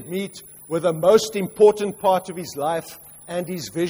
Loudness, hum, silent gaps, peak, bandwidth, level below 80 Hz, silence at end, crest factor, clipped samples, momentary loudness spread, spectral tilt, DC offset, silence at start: -21 LUFS; none; none; -4 dBFS; over 20 kHz; -60 dBFS; 0 s; 18 dB; under 0.1%; 16 LU; -5 dB/octave; under 0.1%; 0 s